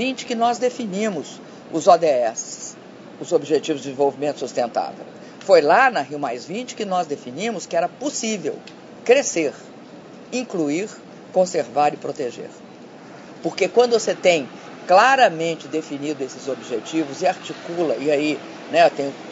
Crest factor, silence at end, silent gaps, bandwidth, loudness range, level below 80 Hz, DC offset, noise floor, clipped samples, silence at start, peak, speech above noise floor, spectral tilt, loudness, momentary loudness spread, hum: 20 dB; 0 s; none; 8 kHz; 6 LU; -74 dBFS; under 0.1%; -41 dBFS; under 0.1%; 0 s; 0 dBFS; 20 dB; -3.5 dB/octave; -21 LUFS; 21 LU; none